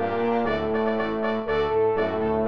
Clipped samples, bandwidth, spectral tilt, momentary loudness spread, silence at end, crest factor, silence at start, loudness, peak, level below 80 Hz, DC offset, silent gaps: under 0.1%; 5.8 kHz; -8 dB/octave; 3 LU; 0 s; 12 dB; 0 s; -24 LUFS; -12 dBFS; -48 dBFS; 0.7%; none